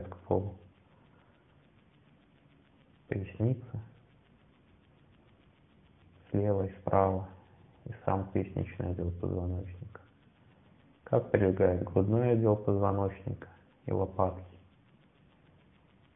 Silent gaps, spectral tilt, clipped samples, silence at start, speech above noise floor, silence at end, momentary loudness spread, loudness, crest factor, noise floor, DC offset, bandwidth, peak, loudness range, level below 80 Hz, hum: none; -12.5 dB/octave; under 0.1%; 0 s; 33 dB; 1.55 s; 19 LU; -32 LUFS; 24 dB; -63 dBFS; under 0.1%; 3.7 kHz; -10 dBFS; 11 LU; -62 dBFS; none